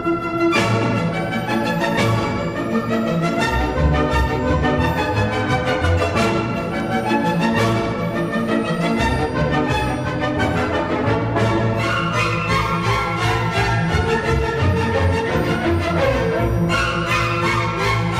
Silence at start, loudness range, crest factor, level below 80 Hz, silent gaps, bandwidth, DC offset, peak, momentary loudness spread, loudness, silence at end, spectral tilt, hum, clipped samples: 0 s; 1 LU; 14 dB; -32 dBFS; none; 14.5 kHz; under 0.1%; -4 dBFS; 3 LU; -19 LUFS; 0 s; -6 dB/octave; none; under 0.1%